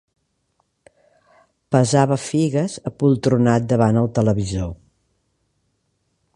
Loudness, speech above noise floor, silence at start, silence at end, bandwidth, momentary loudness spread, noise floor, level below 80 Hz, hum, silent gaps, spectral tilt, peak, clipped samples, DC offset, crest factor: -19 LUFS; 52 dB; 1.7 s; 1.6 s; 11.5 kHz; 8 LU; -69 dBFS; -46 dBFS; none; none; -7 dB/octave; -2 dBFS; under 0.1%; under 0.1%; 20 dB